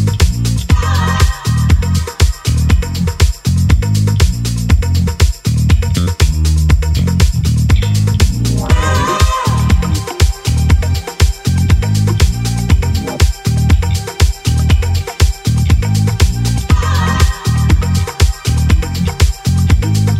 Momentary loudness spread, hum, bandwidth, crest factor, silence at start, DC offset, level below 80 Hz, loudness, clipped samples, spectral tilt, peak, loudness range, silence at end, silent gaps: 3 LU; none; 15.5 kHz; 12 dB; 0 s; under 0.1%; -16 dBFS; -13 LUFS; under 0.1%; -5.5 dB/octave; 0 dBFS; 1 LU; 0 s; none